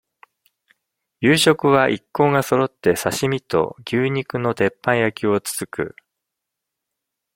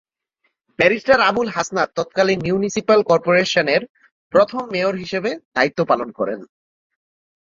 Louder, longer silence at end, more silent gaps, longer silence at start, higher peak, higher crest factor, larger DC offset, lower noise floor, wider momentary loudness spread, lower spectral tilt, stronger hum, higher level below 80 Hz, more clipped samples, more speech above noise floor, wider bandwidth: about the same, -19 LUFS vs -18 LUFS; first, 1.45 s vs 0.95 s; second, none vs 3.89-3.95 s, 4.11-4.30 s, 5.45-5.52 s; first, 1.2 s vs 0.8 s; about the same, -2 dBFS vs 0 dBFS; about the same, 20 dB vs 18 dB; neither; first, -82 dBFS vs -70 dBFS; about the same, 9 LU vs 9 LU; about the same, -4.5 dB/octave vs -4.5 dB/octave; neither; about the same, -58 dBFS vs -56 dBFS; neither; first, 63 dB vs 52 dB; first, 16.5 kHz vs 7.6 kHz